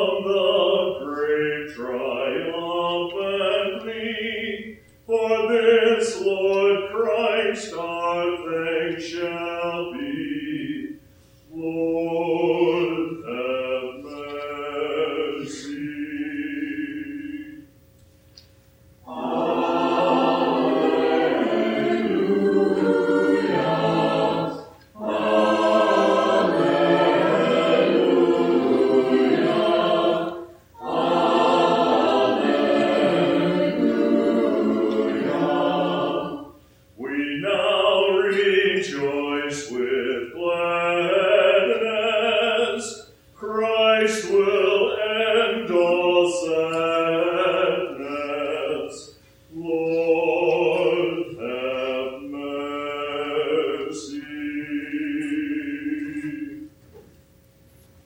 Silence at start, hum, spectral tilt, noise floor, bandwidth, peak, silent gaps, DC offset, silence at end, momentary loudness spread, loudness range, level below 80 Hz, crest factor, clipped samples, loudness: 0 s; none; -5 dB/octave; -54 dBFS; 16.5 kHz; -6 dBFS; none; under 0.1%; 1.05 s; 12 LU; 9 LU; -62 dBFS; 16 dB; under 0.1%; -22 LUFS